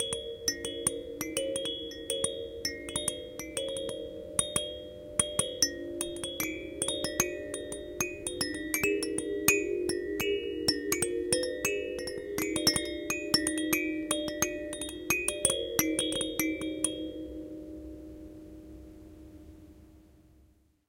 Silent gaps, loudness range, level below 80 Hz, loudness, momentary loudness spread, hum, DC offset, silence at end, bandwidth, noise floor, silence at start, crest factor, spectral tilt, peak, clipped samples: none; 6 LU; -54 dBFS; -31 LUFS; 16 LU; none; under 0.1%; 0.85 s; 16.5 kHz; -64 dBFS; 0 s; 26 dB; -2 dB/octave; -6 dBFS; under 0.1%